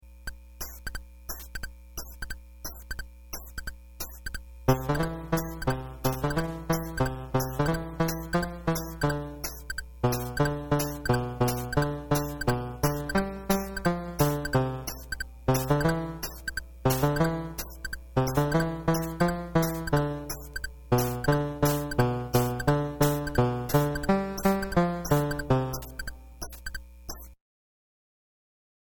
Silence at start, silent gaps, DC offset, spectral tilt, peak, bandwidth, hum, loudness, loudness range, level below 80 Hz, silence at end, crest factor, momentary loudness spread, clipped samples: 0.05 s; none; under 0.1%; -6 dB/octave; -8 dBFS; 18 kHz; none; -29 LUFS; 8 LU; -42 dBFS; 1.55 s; 20 dB; 15 LU; under 0.1%